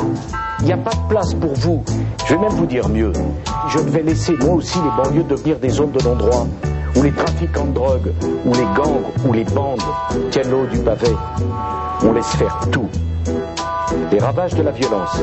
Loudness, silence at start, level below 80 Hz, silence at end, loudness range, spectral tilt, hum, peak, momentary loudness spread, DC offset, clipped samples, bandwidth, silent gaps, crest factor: -18 LUFS; 0 s; -28 dBFS; 0 s; 2 LU; -6.5 dB/octave; none; 0 dBFS; 6 LU; under 0.1%; under 0.1%; 8.4 kHz; none; 16 dB